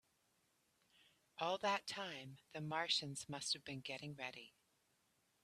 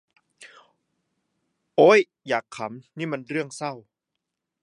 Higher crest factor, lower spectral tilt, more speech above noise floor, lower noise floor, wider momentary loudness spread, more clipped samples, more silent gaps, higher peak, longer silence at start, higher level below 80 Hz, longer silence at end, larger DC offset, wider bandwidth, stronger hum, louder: about the same, 22 dB vs 22 dB; second, -3 dB/octave vs -5 dB/octave; second, 36 dB vs 61 dB; about the same, -81 dBFS vs -83 dBFS; second, 14 LU vs 19 LU; neither; neither; second, -26 dBFS vs -4 dBFS; second, 1.35 s vs 1.8 s; about the same, -84 dBFS vs -82 dBFS; about the same, 0.95 s vs 0.85 s; neither; first, 14 kHz vs 11 kHz; neither; second, -43 LUFS vs -23 LUFS